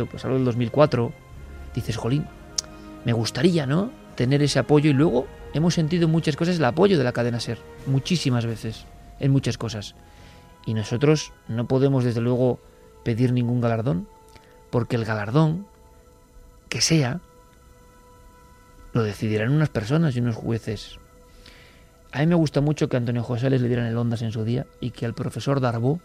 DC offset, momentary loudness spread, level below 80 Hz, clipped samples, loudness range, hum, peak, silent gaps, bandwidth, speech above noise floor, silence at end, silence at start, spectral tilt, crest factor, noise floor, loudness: under 0.1%; 13 LU; -48 dBFS; under 0.1%; 5 LU; none; -4 dBFS; none; 14 kHz; 29 dB; 0.05 s; 0 s; -6 dB/octave; 20 dB; -51 dBFS; -23 LUFS